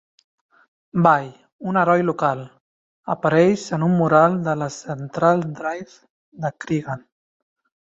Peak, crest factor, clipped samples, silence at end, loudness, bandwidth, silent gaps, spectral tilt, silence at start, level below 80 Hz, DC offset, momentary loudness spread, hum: -2 dBFS; 20 dB; under 0.1%; 0.95 s; -20 LUFS; 7.8 kHz; 1.52-1.59 s, 2.60-3.03 s, 6.10-6.32 s; -7 dB/octave; 0.95 s; -62 dBFS; under 0.1%; 15 LU; none